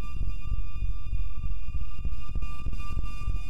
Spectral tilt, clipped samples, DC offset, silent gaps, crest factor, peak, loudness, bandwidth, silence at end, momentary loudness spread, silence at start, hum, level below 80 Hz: -6.5 dB/octave; under 0.1%; 7%; none; 10 dB; -14 dBFS; -37 LUFS; 5.2 kHz; 0 s; 3 LU; 0 s; none; -32 dBFS